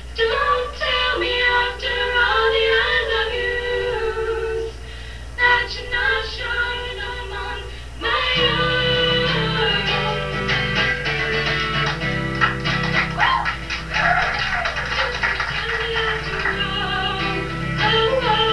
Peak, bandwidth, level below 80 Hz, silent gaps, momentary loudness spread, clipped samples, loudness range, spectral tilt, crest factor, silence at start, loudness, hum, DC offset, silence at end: -2 dBFS; 11 kHz; -34 dBFS; none; 9 LU; under 0.1%; 3 LU; -4.5 dB/octave; 18 dB; 0 s; -19 LUFS; none; 0.8%; 0 s